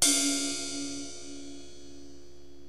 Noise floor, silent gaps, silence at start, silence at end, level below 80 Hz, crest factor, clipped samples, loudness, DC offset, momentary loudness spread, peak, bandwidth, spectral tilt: -53 dBFS; none; 0 s; 0 s; -62 dBFS; 28 dB; under 0.1%; -29 LUFS; 0.9%; 24 LU; -4 dBFS; 16 kHz; -0.5 dB/octave